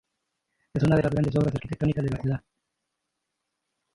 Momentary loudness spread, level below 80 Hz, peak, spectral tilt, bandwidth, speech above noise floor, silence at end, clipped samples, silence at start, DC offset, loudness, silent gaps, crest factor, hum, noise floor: 9 LU; -48 dBFS; -8 dBFS; -8.5 dB/octave; 11 kHz; 57 dB; 1.55 s; under 0.1%; 0.75 s; under 0.1%; -26 LUFS; none; 20 dB; none; -82 dBFS